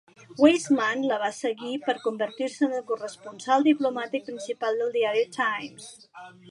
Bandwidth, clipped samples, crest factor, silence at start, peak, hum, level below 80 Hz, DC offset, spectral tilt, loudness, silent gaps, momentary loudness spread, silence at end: 11.5 kHz; under 0.1%; 20 dB; 0.3 s; -6 dBFS; none; -82 dBFS; under 0.1%; -3.5 dB/octave; -26 LUFS; none; 19 LU; 0 s